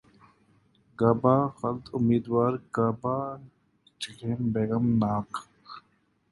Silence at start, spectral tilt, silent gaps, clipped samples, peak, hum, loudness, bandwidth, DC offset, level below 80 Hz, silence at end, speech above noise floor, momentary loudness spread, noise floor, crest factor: 1 s; -8 dB/octave; none; under 0.1%; -6 dBFS; none; -27 LUFS; 11.5 kHz; under 0.1%; -58 dBFS; 0.5 s; 43 dB; 17 LU; -69 dBFS; 22 dB